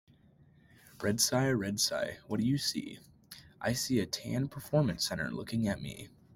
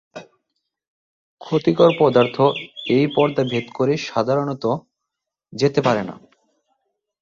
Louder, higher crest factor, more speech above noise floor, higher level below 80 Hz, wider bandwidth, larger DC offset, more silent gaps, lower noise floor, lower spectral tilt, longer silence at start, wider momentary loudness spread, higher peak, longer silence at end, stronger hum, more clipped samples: second, -32 LUFS vs -19 LUFS; about the same, 20 dB vs 18 dB; second, 30 dB vs 64 dB; about the same, -62 dBFS vs -60 dBFS; first, 16.5 kHz vs 7.6 kHz; neither; second, none vs 0.88-1.37 s; second, -62 dBFS vs -82 dBFS; second, -4 dB/octave vs -6.5 dB/octave; first, 0.95 s vs 0.15 s; first, 18 LU vs 9 LU; second, -14 dBFS vs -2 dBFS; second, 0.3 s vs 1.05 s; neither; neither